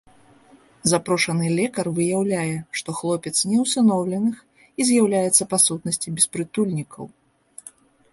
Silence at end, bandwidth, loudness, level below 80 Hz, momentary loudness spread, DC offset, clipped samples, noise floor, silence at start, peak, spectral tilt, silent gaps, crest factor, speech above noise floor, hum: 0.45 s; 12 kHz; -21 LUFS; -62 dBFS; 19 LU; under 0.1%; under 0.1%; -53 dBFS; 0.85 s; -2 dBFS; -4 dB/octave; none; 20 dB; 32 dB; none